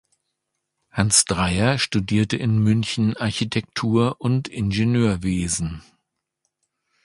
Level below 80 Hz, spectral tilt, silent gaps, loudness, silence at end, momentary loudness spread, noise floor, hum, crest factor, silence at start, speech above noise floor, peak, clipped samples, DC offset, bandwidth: -42 dBFS; -4.5 dB/octave; none; -21 LUFS; 1.25 s; 8 LU; -78 dBFS; none; 22 dB; 0.95 s; 58 dB; 0 dBFS; under 0.1%; under 0.1%; 11.5 kHz